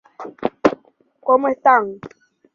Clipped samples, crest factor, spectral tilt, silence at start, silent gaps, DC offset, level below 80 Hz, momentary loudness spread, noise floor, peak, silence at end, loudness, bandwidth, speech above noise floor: under 0.1%; 18 dB; -6 dB/octave; 0.2 s; none; under 0.1%; -60 dBFS; 21 LU; -54 dBFS; -2 dBFS; 0.5 s; -18 LUFS; 7.2 kHz; 37 dB